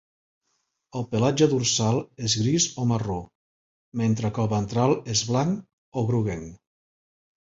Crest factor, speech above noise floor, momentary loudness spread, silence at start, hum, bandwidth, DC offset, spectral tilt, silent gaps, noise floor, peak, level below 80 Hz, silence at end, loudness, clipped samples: 18 dB; 51 dB; 13 LU; 0.95 s; none; 8 kHz; under 0.1%; -5 dB/octave; 3.35-3.92 s, 5.73-5.92 s; -75 dBFS; -8 dBFS; -52 dBFS; 0.9 s; -24 LUFS; under 0.1%